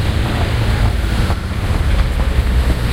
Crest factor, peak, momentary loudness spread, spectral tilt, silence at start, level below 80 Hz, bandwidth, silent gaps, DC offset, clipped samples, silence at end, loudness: 14 dB; -2 dBFS; 2 LU; -6 dB/octave; 0 s; -16 dBFS; 16 kHz; none; under 0.1%; under 0.1%; 0 s; -17 LUFS